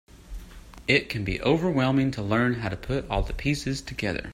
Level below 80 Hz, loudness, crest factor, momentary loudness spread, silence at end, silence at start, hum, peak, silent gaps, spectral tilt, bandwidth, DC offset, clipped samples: -40 dBFS; -26 LUFS; 20 dB; 13 LU; 0 s; 0.15 s; none; -8 dBFS; none; -6 dB/octave; 16 kHz; under 0.1%; under 0.1%